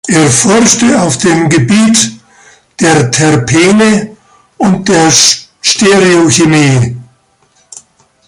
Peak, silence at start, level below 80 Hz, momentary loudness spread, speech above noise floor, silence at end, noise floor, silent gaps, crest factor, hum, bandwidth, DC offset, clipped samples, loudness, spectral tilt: 0 dBFS; 0.05 s; -42 dBFS; 7 LU; 44 dB; 0.5 s; -50 dBFS; none; 8 dB; none; 16 kHz; under 0.1%; 0.2%; -7 LUFS; -4 dB/octave